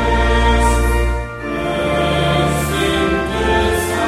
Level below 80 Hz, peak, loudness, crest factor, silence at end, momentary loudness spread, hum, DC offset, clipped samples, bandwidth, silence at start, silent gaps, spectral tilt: -20 dBFS; 0 dBFS; -16 LUFS; 14 dB; 0 s; 6 LU; none; under 0.1%; under 0.1%; 15.5 kHz; 0 s; none; -5 dB/octave